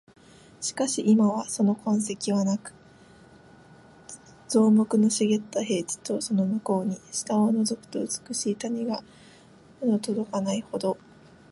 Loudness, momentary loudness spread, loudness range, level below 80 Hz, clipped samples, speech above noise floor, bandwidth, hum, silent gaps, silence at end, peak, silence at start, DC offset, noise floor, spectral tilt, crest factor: -26 LUFS; 11 LU; 5 LU; -68 dBFS; under 0.1%; 28 dB; 11.5 kHz; none; none; 0.55 s; -10 dBFS; 0.6 s; under 0.1%; -53 dBFS; -5 dB/octave; 16 dB